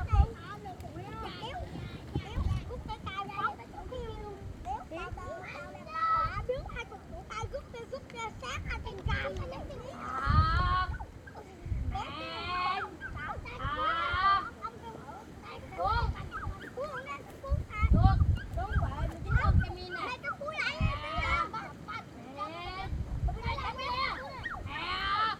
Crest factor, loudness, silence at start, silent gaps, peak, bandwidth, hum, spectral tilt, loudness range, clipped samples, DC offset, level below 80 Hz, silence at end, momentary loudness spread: 24 dB; -34 LUFS; 0 s; none; -8 dBFS; 11 kHz; none; -6 dB/octave; 7 LU; under 0.1%; under 0.1%; -38 dBFS; 0 s; 15 LU